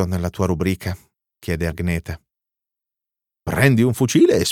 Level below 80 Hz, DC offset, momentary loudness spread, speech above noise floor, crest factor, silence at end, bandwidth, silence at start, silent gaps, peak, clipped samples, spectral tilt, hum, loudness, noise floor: -40 dBFS; under 0.1%; 19 LU; 68 dB; 18 dB; 0 s; 18 kHz; 0 s; none; -2 dBFS; under 0.1%; -6 dB/octave; none; -19 LUFS; -86 dBFS